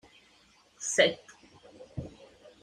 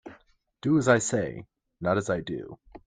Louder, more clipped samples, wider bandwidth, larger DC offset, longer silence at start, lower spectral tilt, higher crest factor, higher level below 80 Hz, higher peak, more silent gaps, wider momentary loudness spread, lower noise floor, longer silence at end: about the same, -27 LUFS vs -27 LUFS; neither; first, 15 kHz vs 9.6 kHz; neither; first, 0.8 s vs 0.05 s; second, -2 dB/octave vs -5.5 dB/octave; about the same, 26 dB vs 22 dB; about the same, -62 dBFS vs -58 dBFS; about the same, -8 dBFS vs -6 dBFS; neither; first, 20 LU vs 16 LU; about the same, -63 dBFS vs -60 dBFS; first, 0.55 s vs 0.1 s